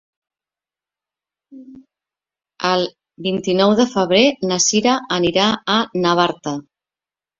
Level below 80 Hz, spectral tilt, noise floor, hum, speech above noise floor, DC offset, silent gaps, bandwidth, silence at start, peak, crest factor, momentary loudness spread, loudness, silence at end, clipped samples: -58 dBFS; -3.5 dB/octave; under -90 dBFS; none; over 73 dB; under 0.1%; none; 7.8 kHz; 1.5 s; -2 dBFS; 18 dB; 11 LU; -17 LUFS; 0.8 s; under 0.1%